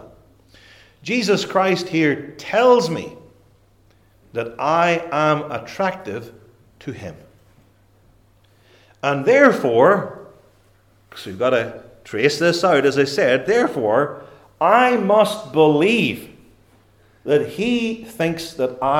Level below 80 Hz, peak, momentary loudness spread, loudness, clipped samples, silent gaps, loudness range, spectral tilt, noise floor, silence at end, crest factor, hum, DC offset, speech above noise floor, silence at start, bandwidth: -58 dBFS; 0 dBFS; 18 LU; -18 LUFS; under 0.1%; none; 7 LU; -5 dB/octave; -55 dBFS; 0 s; 20 dB; none; under 0.1%; 37 dB; 1.05 s; 16 kHz